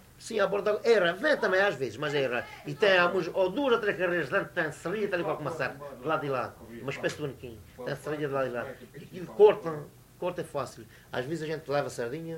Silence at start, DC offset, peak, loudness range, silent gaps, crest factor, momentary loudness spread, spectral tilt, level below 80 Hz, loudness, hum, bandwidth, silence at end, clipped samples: 0.2 s; under 0.1%; -8 dBFS; 7 LU; none; 20 dB; 16 LU; -5 dB/octave; -64 dBFS; -29 LUFS; none; 16 kHz; 0 s; under 0.1%